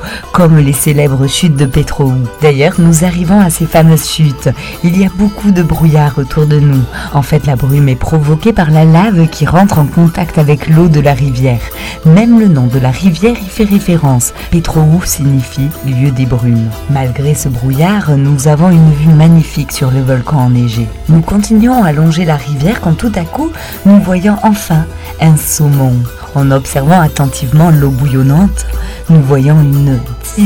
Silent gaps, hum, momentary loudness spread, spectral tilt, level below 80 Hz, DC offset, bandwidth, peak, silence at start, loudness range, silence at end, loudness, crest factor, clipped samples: none; none; 7 LU; -6.5 dB/octave; -26 dBFS; under 0.1%; 17.5 kHz; 0 dBFS; 0 s; 2 LU; 0 s; -9 LUFS; 8 dB; 4%